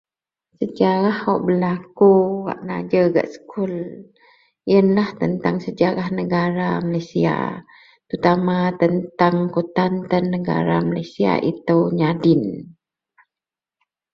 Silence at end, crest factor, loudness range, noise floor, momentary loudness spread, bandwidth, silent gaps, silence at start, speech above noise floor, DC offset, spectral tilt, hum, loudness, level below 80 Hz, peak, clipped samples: 1.4 s; 18 dB; 2 LU; -89 dBFS; 10 LU; 6.8 kHz; none; 0.6 s; 71 dB; under 0.1%; -8.5 dB/octave; none; -19 LUFS; -58 dBFS; -2 dBFS; under 0.1%